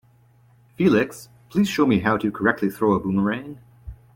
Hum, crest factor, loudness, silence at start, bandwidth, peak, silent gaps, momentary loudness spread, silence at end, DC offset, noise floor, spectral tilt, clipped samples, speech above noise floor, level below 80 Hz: none; 18 dB; -21 LUFS; 0.8 s; 16.5 kHz; -4 dBFS; none; 12 LU; 0.2 s; under 0.1%; -56 dBFS; -6.5 dB/octave; under 0.1%; 35 dB; -50 dBFS